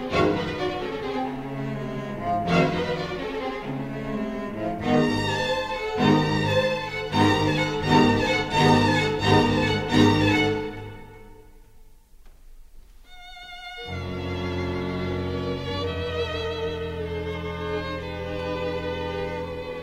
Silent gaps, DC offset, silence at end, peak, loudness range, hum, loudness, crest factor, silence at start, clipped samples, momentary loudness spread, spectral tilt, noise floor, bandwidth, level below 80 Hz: none; under 0.1%; 0 s; -4 dBFS; 12 LU; none; -25 LUFS; 20 dB; 0 s; under 0.1%; 12 LU; -6 dB/octave; -49 dBFS; 15.5 kHz; -44 dBFS